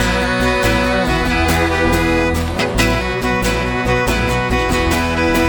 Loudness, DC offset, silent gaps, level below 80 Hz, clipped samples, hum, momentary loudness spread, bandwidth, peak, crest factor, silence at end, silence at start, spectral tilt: -16 LUFS; under 0.1%; none; -24 dBFS; under 0.1%; none; 3 LU; over 20 kHz; -2 dBFS; 14 dB; 0 s; 0 s; -5 dB/octave